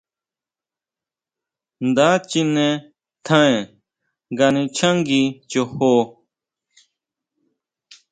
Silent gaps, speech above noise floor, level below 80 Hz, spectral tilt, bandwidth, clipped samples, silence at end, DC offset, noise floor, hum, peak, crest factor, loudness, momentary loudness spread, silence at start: none; over 73 dB; -62 dBFS; -5 dB/octave; 9.4 kHz; under 0.1%; 2 s; under 0.1%; under -90 dBFS; none; 0 dBFS; 20 dB; -18 LUFS; 12 LU; 1.8 s